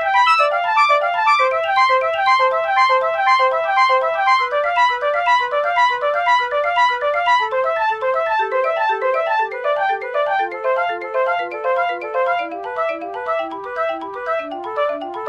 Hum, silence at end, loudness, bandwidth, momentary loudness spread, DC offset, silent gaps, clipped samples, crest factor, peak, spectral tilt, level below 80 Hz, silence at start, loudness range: none; 0 s; -17 LUFS; 10 kHz; 8 LU; under 0.1%; none; under 0.1%; 14 dB; -2 dBFS; -1.5 dB/octave; -60 dBFS; 0 s; 6 LU